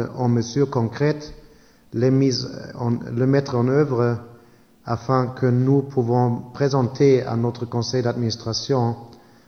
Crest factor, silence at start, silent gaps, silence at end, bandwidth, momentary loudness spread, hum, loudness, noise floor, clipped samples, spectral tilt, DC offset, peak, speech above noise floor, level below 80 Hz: 16 dB; 0 s; none; 0.3 s; 6.6 kHz; 10 LU; none; -21 LUFS; -52 dBFS; under 0.1%; -7 dB/octave; under 0.1%; -6 dBFS; 32 dB; -54 dBFS